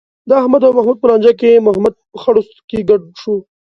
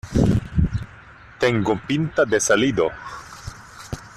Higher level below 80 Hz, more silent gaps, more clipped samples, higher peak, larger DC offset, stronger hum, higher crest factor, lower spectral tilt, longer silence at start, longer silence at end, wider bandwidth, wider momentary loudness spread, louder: second, -52 dBFS vs -36 dBFS; first, 2.64-2.68 s vs none; neither; first, 0 dBFS vs -4 dBFS; neither; neither; second, 12 dB vs 18 dB; first, -7.5 dB/octave vs -5 dB/octave; first, 0.25 s vs 0.05 s; first, 0.3 s vs 0.05 s; second, 6.2 kHz vs 14 kHz; second, 11 LU vs 19 LU; first, -12 LUFS vs -21 LUFS